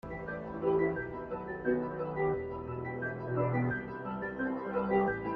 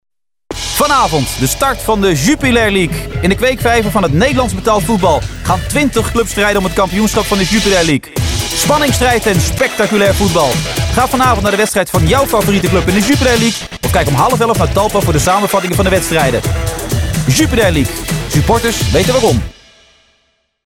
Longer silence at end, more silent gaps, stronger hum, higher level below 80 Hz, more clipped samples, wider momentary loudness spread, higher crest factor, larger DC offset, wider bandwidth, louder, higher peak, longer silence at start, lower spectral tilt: second, 0 s vs 1.15 s; neither; neither; second, -56 dBFS vs -24 dBFS; neither; first, 9 LU vs 5 LU; first, 18 dB vs 12 dB; second, under 0.1% vs 0.1%; second, 4.9 kHz vs 17 kHz; second, -34 LUFS vs -12 LUFS; second, -16 dBFS vs -2 dBFS; second, 0.05 s vs 0.5 s; first, -10.5 dB/octave vs -4.5 dB/octave